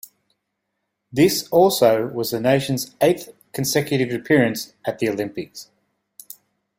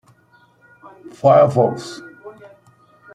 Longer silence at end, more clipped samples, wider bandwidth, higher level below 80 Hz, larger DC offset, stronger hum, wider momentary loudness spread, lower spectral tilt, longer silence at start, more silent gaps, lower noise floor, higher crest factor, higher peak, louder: first, 1.15 s vs 0.85 s; neither; first, 16.5 kHz vs 10.5 kHz; about the same, -58 dBFS vs -62 dBFS; neither; neither; second, 17 LU vs 26 LU; second, -5 dB/octave vs -7 dB/octave; about the same, 1.15 s vs 1.25 s; neither; first, -77 dBFS vs -54 dBFS; about the same, 18 dB vs 18 dB; about the same, -2 dBFS vs -2 dBFS; second, -20 LUFS vs -15 LUFS